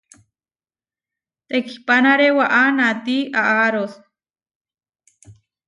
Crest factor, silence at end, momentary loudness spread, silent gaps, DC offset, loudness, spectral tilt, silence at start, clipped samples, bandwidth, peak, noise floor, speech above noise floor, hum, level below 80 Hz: 16 dB; 0.35 s; 10 LU; 4.55-4.61 s; under 0.1%; -16 LUFS; -4.5 dB/octave; 1.5 s; under 0.1%; 10.5 kHz; -4 dBFS; under -90 dBFS; over 73 dB; none; -70 dBFS